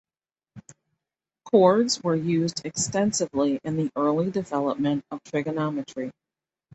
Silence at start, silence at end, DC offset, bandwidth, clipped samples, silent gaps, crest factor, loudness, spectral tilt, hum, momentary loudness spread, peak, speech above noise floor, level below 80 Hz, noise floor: 0.55 s; 0.65 s; under 0.1%; 8.4 kHz; under 0.1%; none; 20 dB; -25 LUFS; -5 dB/octave; none; 11 LU; -6 dBFS; over 66 dB; -64 dBFS; under -90 dBFS